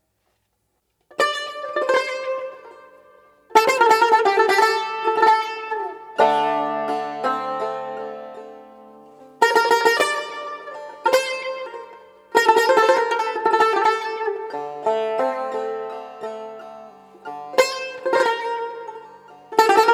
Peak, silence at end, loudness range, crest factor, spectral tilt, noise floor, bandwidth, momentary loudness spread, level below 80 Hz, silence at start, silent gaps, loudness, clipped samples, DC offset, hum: -2 dBFS; 0 s; 8 LU; 20 dB; -2 dB/octave; -71 dBFS; 18 kHz; 19 LU; -72 dBFS; 1.2 s; none; -20 LUFS; under 0.1%; under 0.1%; none